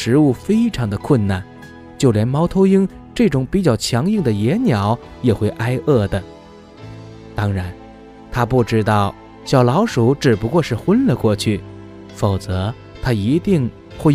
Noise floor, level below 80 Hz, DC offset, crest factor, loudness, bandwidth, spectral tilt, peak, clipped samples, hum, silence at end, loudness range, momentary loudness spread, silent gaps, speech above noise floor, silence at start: -40 dBFS; -40 dBFS; under 0.1%; 16 dB; -17 LUFS; 15 kHz; -7 dB/octave; 0 dBFS; under 0.1%; none; 0 s; 5 LU; 16 LU; none; 24 dB; 0 s